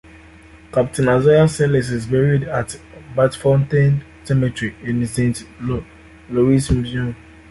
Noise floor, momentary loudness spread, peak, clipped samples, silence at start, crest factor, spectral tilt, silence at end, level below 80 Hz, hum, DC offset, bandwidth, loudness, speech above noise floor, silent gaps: -43 dBFS; 12 LU; -4 dBFS; under 0.1%; 0.55 s; 16 dB; -7 dB/octave; 0.35 s; -38 dBFS; none; under 0.1%; 11.5 kHz; -18 LUFS; 27 dB; none